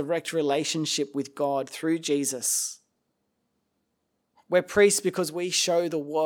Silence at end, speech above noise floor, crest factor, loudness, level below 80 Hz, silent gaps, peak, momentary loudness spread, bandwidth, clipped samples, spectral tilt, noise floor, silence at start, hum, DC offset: 0 s; 51 dB; 18 dB; -25 LUFS; -68 dBFS; none; -8 dBFS; 8 LU; 19.5 kHz; under 0.1%; -3 dB/octave; -77 dBFS; 0 s; none; under 0.1%